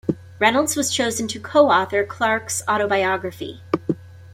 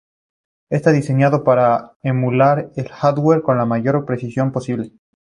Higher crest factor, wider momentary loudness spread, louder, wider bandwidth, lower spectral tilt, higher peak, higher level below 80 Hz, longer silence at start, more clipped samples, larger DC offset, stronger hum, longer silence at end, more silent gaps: about the same, 18 dB vs 16 dB; about the same, 11 LU vs 9 LU; second, -20 LUFS vs -17 LUFS; first, 16.5 kHz vs 10.5 kHz; second, -3 dB/octave vs -8.5 dB/octave; about the same, -2 dBFS vs -2 dBFS; about the same, -60 dBFS vs -56 dBFS; second, 0.05 s vs 0.7 s; neither; neither; neither; second, 0 s vs 0.3 s; second, none vs 1.96-2.00 s